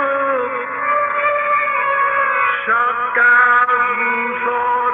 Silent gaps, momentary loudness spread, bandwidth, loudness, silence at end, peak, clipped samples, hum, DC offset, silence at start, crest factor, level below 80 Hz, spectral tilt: none; 7 LU; 4 kHz; -15 LUFS; 0 s; -4 dBFS; under 0.1%; none; under 0.1%; 0 s; 12 dB; -66 dBFS; -5.5 dB/octave